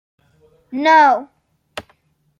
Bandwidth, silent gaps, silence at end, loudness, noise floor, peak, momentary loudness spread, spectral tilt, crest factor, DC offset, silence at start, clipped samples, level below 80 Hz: 11 kHz; none; 0.6 s; -13 LUFS; -59 dBFS; -2 dBFS; 23 LU; -3.5 dB/octave; 16 dB; under 0.1%; 0.7 s; under 0.1%; -64 dBFS